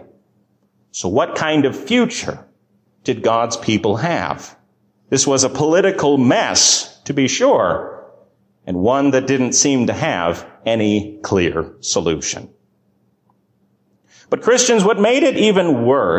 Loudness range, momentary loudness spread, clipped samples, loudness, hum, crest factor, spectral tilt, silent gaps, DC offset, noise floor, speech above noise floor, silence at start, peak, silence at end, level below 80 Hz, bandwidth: 6 LU; 11 LU; under 0.1%; -16 LUFS; none; 16 dB; -3.5 dB/octave; none; under 0.1%; -61 dBFS; 45 dB; 0.95 s; -2 dBFS; 0 s; -48 dBFS; 15.5 kHz